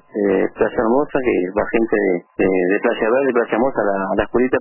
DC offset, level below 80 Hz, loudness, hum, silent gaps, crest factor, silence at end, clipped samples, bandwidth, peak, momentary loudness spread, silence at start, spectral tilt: under 0.1%; -44 dBFS; -18 LUFS; none; none; 12 dB; 0 s; under 0.1%; 3.1 kHz; -6 dBFS; 3 LU; 0.15 s; -11 dB/octave